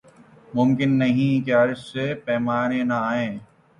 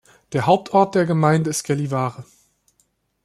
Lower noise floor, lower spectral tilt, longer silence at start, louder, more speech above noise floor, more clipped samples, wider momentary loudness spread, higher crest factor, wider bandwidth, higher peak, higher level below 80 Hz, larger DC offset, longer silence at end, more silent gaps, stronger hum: second, -50 dBFS vs -66 dBFS; first, -7.5 dB/octave vs -6 dB/octave; first, 0.5 s vs 0.3 s; second, -22 LUFS vs -19 LUFS; second, 29 dB vs 47 dB; neither; about the same, 8 LU vs 8 LU; about the same, 14 dB vs 18 dB; second, 10.5 kHz vs 13.5 kHz; second, -8 dBFS vs -2 dBFS; about the same, -60 dBFS vs -60 dBFS; neither; second, 0.35 s vs 1 s; neither; neither